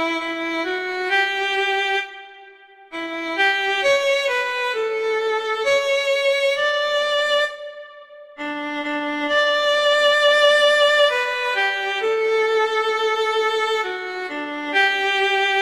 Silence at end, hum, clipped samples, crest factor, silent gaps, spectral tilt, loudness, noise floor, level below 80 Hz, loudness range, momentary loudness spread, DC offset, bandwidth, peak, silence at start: 0 s; none; under 0.1%; 16 dB; none; -0.5 dB/octave; -19 LUFS; -46 dBFS; -66 dBFS; 5 LU; 12 LU; under 0.1%; 15 kHz; -4 dBFS; 0 s